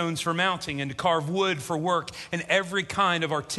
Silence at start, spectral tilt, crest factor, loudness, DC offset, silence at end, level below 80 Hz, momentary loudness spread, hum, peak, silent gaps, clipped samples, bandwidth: 0 s; -4 dB/octave; 20 dB; -26 LUFS; under 0.1%; 0 s; -58 dBFS; 6 LU; none; -8 dBFS; none; under 0.1%; 12.5 kHz